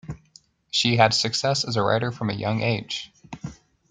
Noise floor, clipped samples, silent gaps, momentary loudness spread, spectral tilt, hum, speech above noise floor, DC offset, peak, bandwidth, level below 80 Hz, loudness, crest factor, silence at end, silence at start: -56 dBFS; under 0.1%; none; 21 LU; -4 dB/octave; none; 33 dB; under 0.1%; -2 dBFS; 9.6 kHz; -56 dBFS; -23 LUFS; 22 dB; 0.35 s; 0.05 s